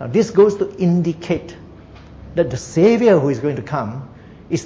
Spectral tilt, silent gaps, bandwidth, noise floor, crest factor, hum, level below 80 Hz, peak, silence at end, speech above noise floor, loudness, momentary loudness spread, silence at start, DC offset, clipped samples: -7 dB/octave; none; 8 kHz; -40 dBFS; 16 dB; none; -46 dBFS; -2 dBFS; 0 s; 23 dB; -17 LUFS; 12 LU; 0 s; under 0.1%; under 0.1%